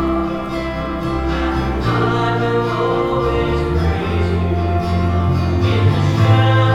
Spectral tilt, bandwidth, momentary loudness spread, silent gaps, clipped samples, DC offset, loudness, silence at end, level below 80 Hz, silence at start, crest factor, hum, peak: -7.5 dB/octave; 9.8 kHz; 7 LU; none; under 0.1%; under 0.1%; -17 LUFS; 0 s; -28 dBFS; 0 s; 14 dB; none; -2 dBFS